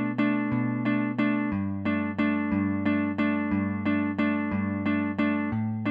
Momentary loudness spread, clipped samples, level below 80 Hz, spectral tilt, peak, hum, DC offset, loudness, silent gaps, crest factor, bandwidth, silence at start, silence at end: 2 LU; under 0.1%; -58 dBFS; -9.5 dB/octave; -12 dBFS; none; under 0.1%; -27 LUFS; none; 14 dB; 5 kHz; 0 s; 0 s